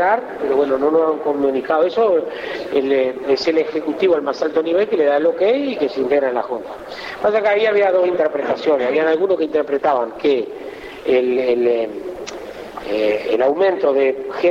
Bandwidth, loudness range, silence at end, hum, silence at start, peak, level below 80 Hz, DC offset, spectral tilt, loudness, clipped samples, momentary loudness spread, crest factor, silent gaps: 7.6 kHz; 2 LU; 0 s; none; 0 s; -6 dBFS; -56 dBFS; under 0.1%; -5 dB/octave; -18 LUFS; under 0.1%; 11 LU; 12 dB; none